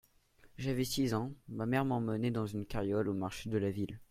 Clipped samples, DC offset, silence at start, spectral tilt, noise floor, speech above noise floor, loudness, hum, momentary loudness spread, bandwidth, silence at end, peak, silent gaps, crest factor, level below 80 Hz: under 0.1%; under 0.1%; 0.45 s; -6 dB/octave; -64 dBFS; 30 dB; -36 LUFS; none; 7 LU; 16 kHz; 0.05 s; -16 dBFS; none; 18 dB; -58 dBFS